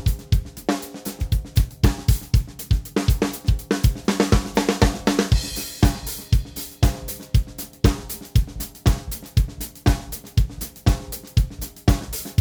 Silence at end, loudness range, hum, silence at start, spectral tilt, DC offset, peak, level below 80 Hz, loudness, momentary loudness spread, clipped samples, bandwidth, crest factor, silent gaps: 0 s; 3 LU; none; 0 s; -5.5 dB/octave; under 0.1%; -2 dBFS; -24 dBFS; -23 LUFS; 8 LU; under 0.1%; over 20 kHz; 20 dB; none